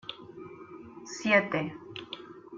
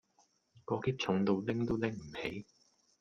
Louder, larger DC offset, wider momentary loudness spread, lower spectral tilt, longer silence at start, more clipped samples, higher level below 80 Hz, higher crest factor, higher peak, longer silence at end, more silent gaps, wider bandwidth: first, -28 LUFS vs -35 LUFS; neither; first, 22 LU vs 10 LU; second, -4.5 dB/octave vs -6.5 dB/octave; second, 0.05 s vs 0.55 s; neither; second, -70 dBFS vs -62 dBFS; about the same, 22 dB vs 18 dB; first, -10 dBFS vs -18 dBFS; second, 0 s vs 0.55 s; neither; about the same, 7.8 kHz vs 7.4 kHz